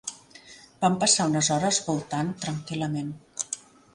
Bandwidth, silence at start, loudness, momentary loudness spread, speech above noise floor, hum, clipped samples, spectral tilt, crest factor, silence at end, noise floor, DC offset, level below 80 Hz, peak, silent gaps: 11.5 kHz; 0.05 s; -26 LUFS; 13 LU; 24 dB; none; under 0.1%; -3.5 dB/octave; 20 dB; 0.35 s; -50 dBFS; under 0.1%; -62 dBFS; -8 dBFS; none